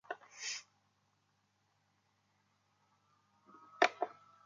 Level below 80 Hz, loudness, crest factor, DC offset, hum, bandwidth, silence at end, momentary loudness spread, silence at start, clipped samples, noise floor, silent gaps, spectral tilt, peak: under -90 dBFS; -37 LUFS; 30 dB; under 0.1%; 50 Hz at -85 dBFS; 9.4 kHz; 0.35 s; 13 LU; 0.1 s; under 0.1%; -78 dBFS; none; -0.5 dB/octave; -14 dBFS